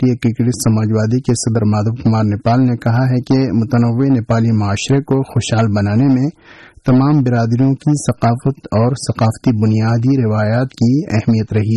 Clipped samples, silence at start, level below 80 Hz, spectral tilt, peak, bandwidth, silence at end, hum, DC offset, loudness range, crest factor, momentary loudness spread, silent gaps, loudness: under 0.1%; 0 s; -44 dBFS; -7 dB/octave; -4 dBFS; 12 kHz; 0 s; none; under 0.1%; 1 LU; 10 dB; 3 LU; none; -15 LUFS